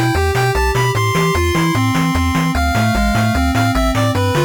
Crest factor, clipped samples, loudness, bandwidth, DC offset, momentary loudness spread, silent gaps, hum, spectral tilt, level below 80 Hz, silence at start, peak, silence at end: 10 dB; under 0.1%; -15 LUFS; 19 kHz; under 0.1%; 1 LU; none; none; -5.5 dB/octave; -24 dBFS; 0 s; -4 dBFS; 0 s